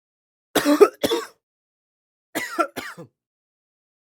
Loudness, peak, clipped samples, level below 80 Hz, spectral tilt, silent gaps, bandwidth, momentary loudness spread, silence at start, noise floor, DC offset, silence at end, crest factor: -21 LUFS; 0 dBFS; under 0.1%; -64 dBFS; -3 dB/octave; 1.43-2.33 s; 17.5 kHz; 18 LU; 0.55 s; under -90 dBFS; under 0.1%; 1 s; 24 dB